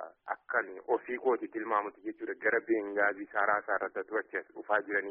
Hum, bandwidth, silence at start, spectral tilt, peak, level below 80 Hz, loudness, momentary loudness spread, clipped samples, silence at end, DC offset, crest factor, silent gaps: none; 3.7 kHz; 0 s; 4 dB/octave; -14 dBFS; -78 dBFS; -33 LUFS; 10 LU; under 0.1%; 0 s; under 0.1%; 18 dB; none